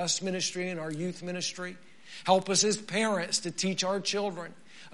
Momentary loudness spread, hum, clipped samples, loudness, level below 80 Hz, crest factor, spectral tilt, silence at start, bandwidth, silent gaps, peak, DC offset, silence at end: 14 LU; none; under 0.1%; -29 LUFS; -76 dBFS; 22 dB; -3 dB/octave; 0 s; 11.5 kHz; none; -8 dBFS; 0.3%; 0.05 s